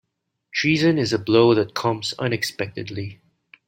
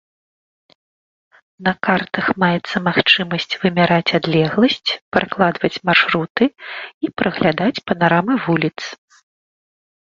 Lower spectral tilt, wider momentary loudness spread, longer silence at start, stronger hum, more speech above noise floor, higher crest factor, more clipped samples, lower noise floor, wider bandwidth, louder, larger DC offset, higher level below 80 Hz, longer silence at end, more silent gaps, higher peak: about the same, -5.5 dB/octave vs -6 dB/octave; first, 14 LU vs 8 LU; second, 0.55 s vs 1.6 s; neither; second, 46 dB vs over 73 dB; about the same, 18 dB vs 18 dB; neither; second, -67 dBFS vs under -90 dBFS; first, 16.5 kHz vs 7.4 kHz; second, -21 LUFS vs -17 LUFS; neither; second, -60 dBFS vs -54 dBFS; second, 0.55 s vs 1.25 s; second, none vs 5.02-5.11 s, 6.30-6.35 s, 6.94-7.01 s; second, -4 dBFS vs 0 dBFS